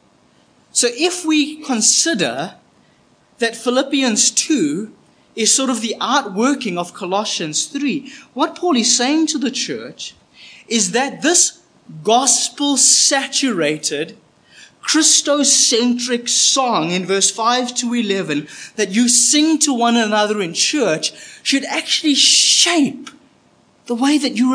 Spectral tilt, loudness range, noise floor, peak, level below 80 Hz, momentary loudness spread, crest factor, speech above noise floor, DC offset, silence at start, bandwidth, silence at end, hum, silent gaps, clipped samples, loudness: -1.5 dB/octave; 4 LU; -54 dBFS; 0 dBFS; -74 dBFS; 13 LU; 18 dB; 38 dB; under 0.1%; 0.75 s; 10.5 kHz; 0 s; none; none; under 0.1%; -15 LUFS